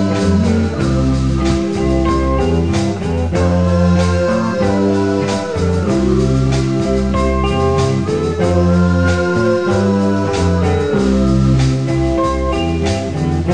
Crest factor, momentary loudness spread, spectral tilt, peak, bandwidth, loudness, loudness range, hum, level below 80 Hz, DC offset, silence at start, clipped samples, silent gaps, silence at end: 12 dB; 4 LU; -7 dB/octave; -2 dBFS; 10 kHz; -15 LUFS; 1 LU; none; -24 dBFS; 1%; 0 s; under 0.1%; none; 0 s